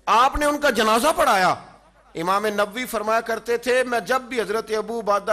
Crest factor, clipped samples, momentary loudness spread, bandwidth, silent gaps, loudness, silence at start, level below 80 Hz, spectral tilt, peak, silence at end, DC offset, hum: 12 dB; under 0.1%; 8 LU; 15 kHz; none; -21 LUFS; 0.05 s; -44 dBFS; -3 dB/octave; -8 dBFS; 0 s; under 0.1%; none